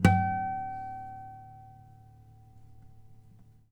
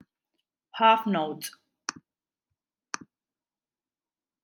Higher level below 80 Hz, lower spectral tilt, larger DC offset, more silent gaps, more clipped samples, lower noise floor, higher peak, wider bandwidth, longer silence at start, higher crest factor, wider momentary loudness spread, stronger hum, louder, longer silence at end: first, -52 dBFS vs -86 dBFS; first, -7 dB/octave vs -3.5 dB/octave; neither; neither; neither; second, -56 dBFS vs under -90 dBFS; about the same, -6 dBFS vs -6 dBFS; about the same, 17 kHz vs 17 kHz; second, 0 s vs 0.75 s; about the same, 28 dB vs 24 dB; first, 28 LU vs 18 LU; neither; second, -32 LUFS vs -25 LUFS; second, 0.3 s vs 2.55 s